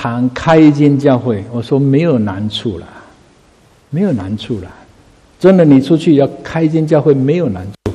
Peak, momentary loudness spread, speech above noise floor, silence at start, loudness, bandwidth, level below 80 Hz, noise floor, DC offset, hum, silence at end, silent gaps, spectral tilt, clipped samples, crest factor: 0 dBFS; 13 LU; 36 dB; 0 s; -12 LUFS; 10 kHz; -44 dBFS; -48 dBFS; under 0.1%; none; 0 s; none; -8 dB/octave; 0.2%; 12 dB